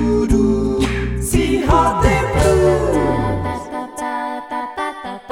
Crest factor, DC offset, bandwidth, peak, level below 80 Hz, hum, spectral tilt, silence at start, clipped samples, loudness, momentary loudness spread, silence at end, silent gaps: 14 dB; under 0.1%; 17 kHz; -2 dBFS; -26 dBFS; none; -6 dB/octave; 0 s; under 0.1%; -17 LUFS; 11 LU; 0 s; none